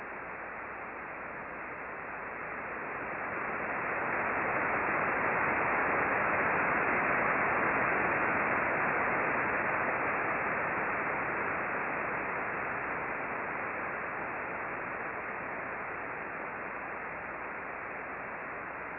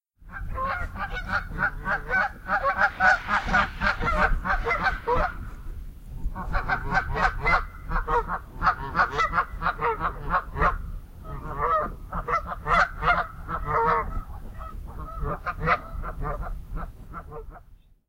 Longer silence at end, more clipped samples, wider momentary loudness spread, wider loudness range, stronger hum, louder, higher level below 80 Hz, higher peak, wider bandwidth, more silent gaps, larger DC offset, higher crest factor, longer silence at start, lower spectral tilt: second, 0 s vs 0.35 s; neither; second, 11 LU vs 17 LU; first, 9 LU vs 5 LU; neither; second, -32 LUFS vs -26 LUFS; second, -62 dBFS vs -34 dBFS; second, -16 dBFS vs -6 dBFS; second, 4.4 kHz vs 16 kHz; neither; neither; about the same, 16 dB vs 20 dB; second, 0 s vs 0.2 s; first, -9.5 dB/octave vs -5.5 dB/octave